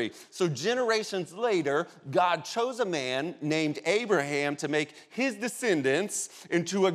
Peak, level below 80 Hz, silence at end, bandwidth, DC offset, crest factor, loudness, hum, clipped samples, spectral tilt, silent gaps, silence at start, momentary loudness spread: -12 dBFS; -84 dBFS; 0 s; 15 kHz; under 0.1%; 18 dB; -29 LUFS; none; under 0.1%; -4 dB/octave; none; 0 s; 5 LU